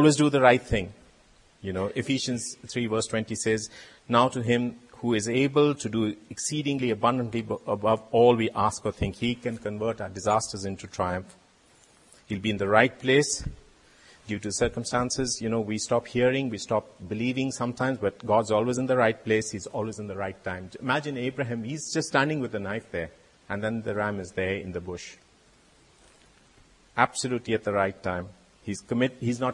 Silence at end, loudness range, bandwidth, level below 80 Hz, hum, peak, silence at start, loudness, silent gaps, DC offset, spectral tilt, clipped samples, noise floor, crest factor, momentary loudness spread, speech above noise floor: 0 s; 6 LU; 11.5 kHz; -52 dBFS; none; -2 dBFS; 0 s; -27 LUFS; none; under 0.1%; -4.5 dB/octave; under 0.1%; -59 dBFS; 24 dB; 13 LU; 33 dB